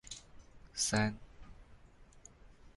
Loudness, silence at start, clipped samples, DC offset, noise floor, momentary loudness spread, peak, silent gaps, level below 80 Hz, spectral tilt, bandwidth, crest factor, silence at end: -35 LUFS; 0.05 s; under 0.1%; under 0.1%; -59 dBFS; 27 LU; -20 dBFS; none; -58 dBFS; -3.5 dB/octave; 11.5 kHz; 20 dB; 0.05 s